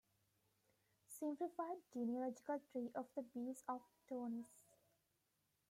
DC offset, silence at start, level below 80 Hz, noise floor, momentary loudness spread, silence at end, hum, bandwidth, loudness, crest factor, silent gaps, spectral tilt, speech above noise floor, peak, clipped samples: under 0.1%; 1.1 s; under -90 dBFS; -86 dBFS; 7 LU; 1.1 s; none; 16 kHz; -48 LUFS; 16 dB; none; -6 dB/octave; 38 dB; -34 dBFS; under 0.1%